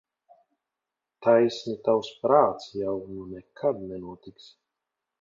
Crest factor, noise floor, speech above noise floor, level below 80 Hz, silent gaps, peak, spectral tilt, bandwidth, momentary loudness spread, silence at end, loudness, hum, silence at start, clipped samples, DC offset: 22 dB; -87 dBFS; 62 dB; -64 dBFS; none; -6 dBFS; -6.5 dB/octave; 7.4 kHz; 18 LU; 0.9 s; -25 LUFS; none; 1.2 s; under 0.1%; under 0.1%